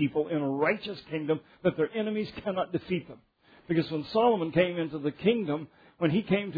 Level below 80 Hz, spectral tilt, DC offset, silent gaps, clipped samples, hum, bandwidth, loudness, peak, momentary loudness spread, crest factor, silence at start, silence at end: -64 dBFS; -9 dB/octave; under 0.1%; none; under 0.1%; none; 5 kHz; -29 LUFS; -10 dBFS; 8 LU; 18 dB; 0 s; 0 s